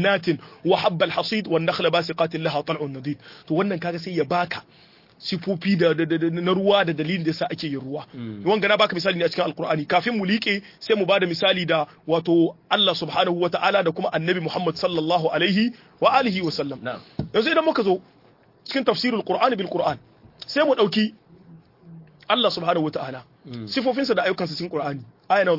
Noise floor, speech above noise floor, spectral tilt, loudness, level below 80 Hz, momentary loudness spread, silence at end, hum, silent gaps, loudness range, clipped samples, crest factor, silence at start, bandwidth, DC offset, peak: -55 dBFS; 33 dB; -6.5 dB/octave; -22 LUFS; -64 dBFS; 10 LU; 0 s; none; none; 4 LU; under 0.1%; 18 dB; 0 s; 5.8 kHz; under 0.1%; -4 dBFS